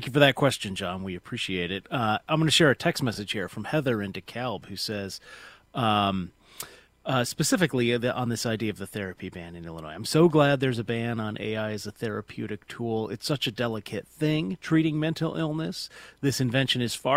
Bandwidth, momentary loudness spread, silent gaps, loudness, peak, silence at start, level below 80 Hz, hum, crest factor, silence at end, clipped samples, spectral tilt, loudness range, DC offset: 16 kHz; 16 LU; none; -27 LUFS; -2 dBFS; 0 s; -58 dBFS; none; 24 dB; 0 s; under 0.1%; -5 dB/octave; 4 LU; under 0.1%